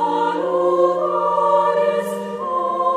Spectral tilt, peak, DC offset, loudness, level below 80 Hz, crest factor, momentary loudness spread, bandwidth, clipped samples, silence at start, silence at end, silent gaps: -6 dB/octave; -4 dBFS; under 0.1%; -19 LUFS; -64 dBFS; 14 dB; 7 LU; 15 kHz; under 0.1%; 0 s; 0 s; none